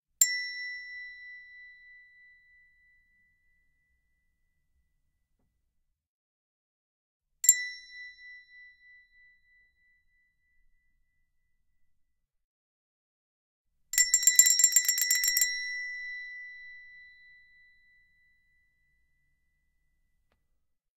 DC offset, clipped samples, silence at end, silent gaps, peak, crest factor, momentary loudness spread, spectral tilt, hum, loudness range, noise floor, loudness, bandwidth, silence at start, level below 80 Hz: under 0.1%; under 0.1%; 4.1 s; 6.06-7.20 s, 12.44-13.65 s; -4 dBFS; 32 dB; 26 LU; 7 dB/octave; none; 20 LU; -78 dBFS; -24 LUFS; 16.5 kHz; 0.2 s; -74 dBFS